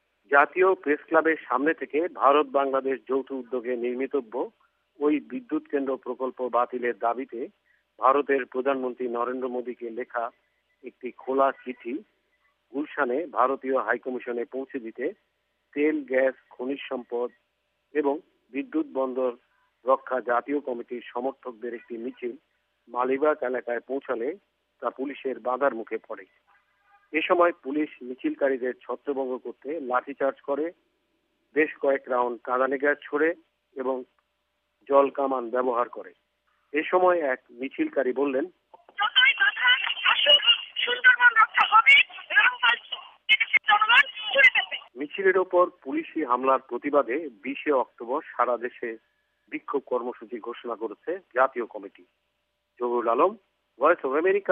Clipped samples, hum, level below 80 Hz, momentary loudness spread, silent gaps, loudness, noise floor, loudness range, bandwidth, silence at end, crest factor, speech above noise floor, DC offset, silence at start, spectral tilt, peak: under 0.1%; none; -80 dBFS; 17 LU; none; -25 LUFS; -76 dBFS; 12 LU; 8.4 kHz; 0 s; 20 dB; 50 dB; under 0.1%; 0.3 s; -4 dB/octave; -6 dBFS